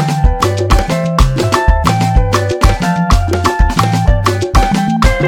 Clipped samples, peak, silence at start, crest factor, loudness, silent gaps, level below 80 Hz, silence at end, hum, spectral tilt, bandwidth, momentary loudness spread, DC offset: 0.2%; 0 dBFS; 0 s; 10 dB; -13 LUFS; none; -14 dBFS; 0 s; none; -5.5 dB/octave; 16.5 kHz; 2 LU; under 0.1%